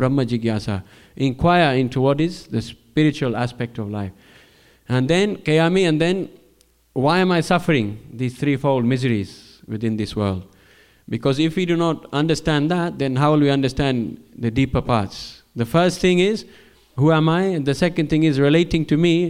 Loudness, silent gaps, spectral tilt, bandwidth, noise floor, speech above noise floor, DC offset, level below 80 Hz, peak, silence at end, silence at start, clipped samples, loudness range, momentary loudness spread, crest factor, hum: -20 LUFS; none; -6.5 dB/octave; 15 kHz; -57 dBFS; 38 dB; under 0.1%; -44 dBFS; -4 dBFS; 0 s; 0 s; under 0.1%; 4 LU; 12 LU; 16 dB; none